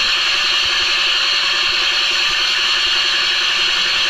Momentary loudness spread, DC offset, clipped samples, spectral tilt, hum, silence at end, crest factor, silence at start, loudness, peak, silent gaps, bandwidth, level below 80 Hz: 1 LU; under 0.1%; under 0.1%; 1.5 dB/octave; none; 0 s; 12 dB; 0 s; -13 LUFS; -4 dBFS; none; 15.5 kHz; -44 dBFS